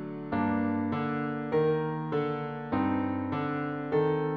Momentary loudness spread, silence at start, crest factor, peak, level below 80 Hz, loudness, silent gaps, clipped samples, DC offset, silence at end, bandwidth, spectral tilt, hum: 5 LU; 0 s; 14 dB; -16 dBFS; -62 dBFS; -30 LUFS; none; under 0.1%; under 0.1%; 0 s; 5 kHz; -10 dB/octave; none